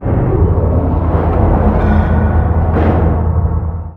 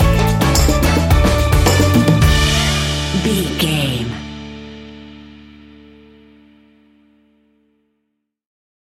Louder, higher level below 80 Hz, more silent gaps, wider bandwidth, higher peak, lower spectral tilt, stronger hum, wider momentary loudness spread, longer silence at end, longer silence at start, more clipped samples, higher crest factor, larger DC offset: about the same, -13 LUFS vs -14 LUFS; first, -16 dBFS vs -22 dBFS; neither; second, 3.8 kHz vs 17 kHz; about the same, 0 dBFS vs -2 dBFS; first, -11.5 dB/octave vs -5 dB/octave; neither; second, 3 LU vs 20 LU; second, 0 s vs 3.55 s; about the same, 0 s vs 0 s; neither; about the same, 12 dB vs 14 dB; neither